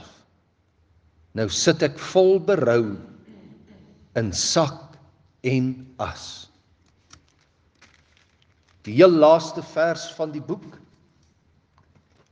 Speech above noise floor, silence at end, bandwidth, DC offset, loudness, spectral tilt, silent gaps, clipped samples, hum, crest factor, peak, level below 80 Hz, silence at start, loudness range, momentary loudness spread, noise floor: 44 dB; 1.6 s; 10 kHz; under 0.1%; -21 LUFS; -4.5 dB/octave; none; under 0.1%; none; 24 dB; 0 dBFS; -60 dBFS; 1.35 s; 10 LU; 19 LU; -64 dBFS